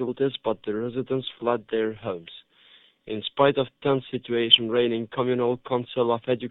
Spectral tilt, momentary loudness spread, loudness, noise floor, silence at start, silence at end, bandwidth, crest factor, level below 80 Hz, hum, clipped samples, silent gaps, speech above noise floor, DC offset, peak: -9 dB/octave; 14 LU; -25 LUFS; -56 dBFS; 0 s; 0 s; 4.1 kHz; 24 dB; -62 dBFS; none; under 0.1%; none; 31 dB; under 0.1%; -2 dBFS